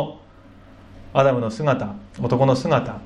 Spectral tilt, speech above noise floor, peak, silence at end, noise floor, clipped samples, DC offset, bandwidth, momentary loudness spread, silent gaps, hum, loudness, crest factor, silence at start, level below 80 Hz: -7.5 dB/octave; 27 dB; -4 dBFS; 0 s; -46 dBFS; under 0.1%; under 0.1%; 10.5 kHz; 11 LU; none; none; -21 LUFS; 18 dB; 0 s; -50 dBFS